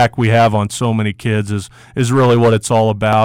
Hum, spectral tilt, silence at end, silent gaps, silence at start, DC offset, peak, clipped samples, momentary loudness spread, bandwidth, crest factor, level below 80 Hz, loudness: none; -6 dB/octave; 0 s; none; 0 s; under 0.1%; -4 dBFS; under 0.1%; 9 LU; 15.5 kHz; 8 dB; -46 dBFS; -14 LUFS